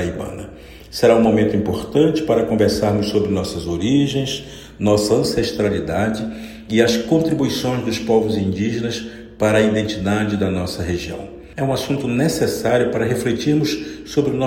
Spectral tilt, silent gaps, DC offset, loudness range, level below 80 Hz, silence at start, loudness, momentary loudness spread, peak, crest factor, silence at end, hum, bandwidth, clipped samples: -5.5 dB/octave; none; under 0.1%; 3 LU; -42 dBFS; 0 s; -19 LUFS; 11 LU; -2 dBFS; 18 dB; 0 s; none; 16.5 kHz; under 0.1%